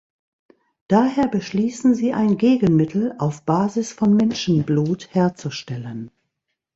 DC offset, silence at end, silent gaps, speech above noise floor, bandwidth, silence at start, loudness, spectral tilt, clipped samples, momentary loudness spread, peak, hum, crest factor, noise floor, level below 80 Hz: under 0.1%; 0.7 s; none; 59 dB; 8 kHz; 0.9 s; -20 LUFS; -7 dB/octave; under 0.1%; 13 LU; -2 dBFS; none; 18 dB; -78 dBFS; -56 dBFS